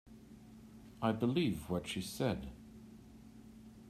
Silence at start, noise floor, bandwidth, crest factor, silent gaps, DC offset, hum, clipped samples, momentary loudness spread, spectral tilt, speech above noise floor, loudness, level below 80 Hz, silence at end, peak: 0.05 s; -56 dBFS; 15.5 kHz; 22 dB; none; under 0.1%; none; under 0.1%; 23 LU; -6 dB/octave; 20 dB; -37 LUFS; -60 dBFS; 0 s; -18 dBFS